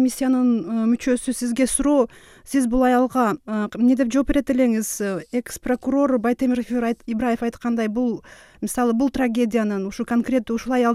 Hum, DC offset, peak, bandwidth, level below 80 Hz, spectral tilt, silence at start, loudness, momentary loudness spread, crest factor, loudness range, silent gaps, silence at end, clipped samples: none; under 0.1%; -6 dBFS; 15 kHz; -44 dBFS; -5 dB/octave; 0 s; -21 LUFS; 7 LU; 14 dB; 3 LU; none; 0 s; under 0.1%